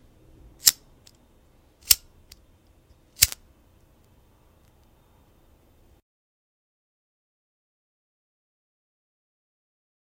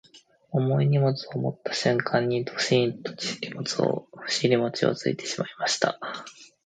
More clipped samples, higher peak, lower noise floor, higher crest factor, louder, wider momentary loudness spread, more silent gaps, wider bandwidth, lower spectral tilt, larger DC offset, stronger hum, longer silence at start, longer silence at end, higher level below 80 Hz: neither; first, 0 dBFS vs -4 dBFS; first, -58 dBFS vs -53 dBFS; first, 34 dB vs 22 dB; first, -21 LUFS vs -26 LUFS; first, 15 LU vs 9 LU; neither; first, 16 kHz vs 9.4 kHz; second, 1.5 dB/octave vs -5 dB/octave; neither; neither; first, 0.65 s vs 0.15 s; first, 6.8 s vs 0.2 s; first, -54 dBFS vs -70 dBFS